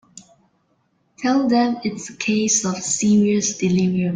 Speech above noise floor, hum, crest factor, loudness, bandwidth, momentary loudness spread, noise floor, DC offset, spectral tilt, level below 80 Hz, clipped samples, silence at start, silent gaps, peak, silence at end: 46 dB; none; 14 dB; -19 LUFS; 9.6 kHz; 9 LU; -65 dBFS; under 0.1%; -4.5 dB/octave; -58 dBFS; under 0.1%; 0.15 s; none; -6 dBFS; 0 s